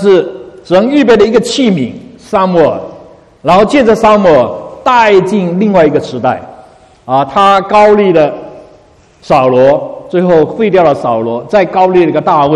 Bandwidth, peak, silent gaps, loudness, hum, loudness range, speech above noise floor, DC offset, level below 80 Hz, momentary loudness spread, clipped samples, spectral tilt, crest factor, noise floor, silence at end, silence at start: 11.5 kHz; 0 dBFS; none; -9 LUFS; none; 2 LU; 34 dB; under 0.1%; -42 dBFS; 9 LU; 1%; -6 dB/octave; 8 dB; -42 dBFS; 0 s; 0 s